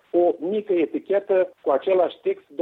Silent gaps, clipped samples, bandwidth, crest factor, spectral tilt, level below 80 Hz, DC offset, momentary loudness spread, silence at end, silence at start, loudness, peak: none; under 0.1%; 4.1 kHz; 14 dB; -8 dB/octave; -74 dBFS; under 0.1%; 5 LU; 0 s; 0.15 s; -23 LUFS; -8 dBFS